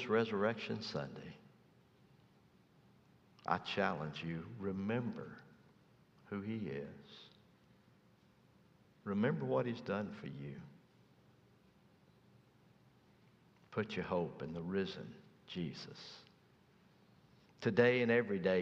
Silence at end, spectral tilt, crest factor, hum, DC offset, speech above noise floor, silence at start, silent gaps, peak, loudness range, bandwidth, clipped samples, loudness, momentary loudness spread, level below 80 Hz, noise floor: 0 s; -7 dB/octave; 24 dB; none; under 0.1%; 30 dB; 0 s; none; -16 dBFS; 8 LU; 7.6 kHz; under 0.1%; -39 LUFS; 21 LU; -76 dBFS; -69 dBFS